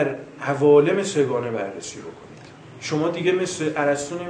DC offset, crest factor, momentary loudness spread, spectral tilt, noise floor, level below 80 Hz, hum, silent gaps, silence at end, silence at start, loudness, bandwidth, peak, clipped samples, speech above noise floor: under 0.1%; 18 dB; 18 LU; -5 dB/octave; -42 dBFS; -64 dBFS; none; none; 0 s; 0 s; -21 LUFS; 10 kHz; -4 dBFS; under 0.1%; 21 dB